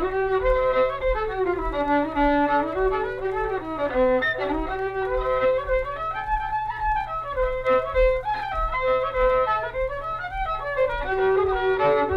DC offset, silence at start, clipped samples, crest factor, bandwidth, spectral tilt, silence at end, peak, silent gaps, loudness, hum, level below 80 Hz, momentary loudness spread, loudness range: under 0.1%; 0 s; under 0.1%; 14 dB; 6 kHz; -7 dB/octave; 0 s; -10 dBFS; none; -24 LUFS; none; -36 dBFS; 7 LU; 2 LU